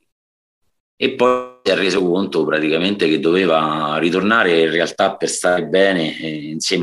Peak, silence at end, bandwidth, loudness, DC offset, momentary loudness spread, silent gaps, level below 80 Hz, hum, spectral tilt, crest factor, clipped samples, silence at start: -2 dBFS; 0 s; 12.5 kHz; -17 LUFS; under 0.1%; 6 LU; none; -60 dBFS; none; -4 dB/octave; 16 dB; under 0.1%; 1 s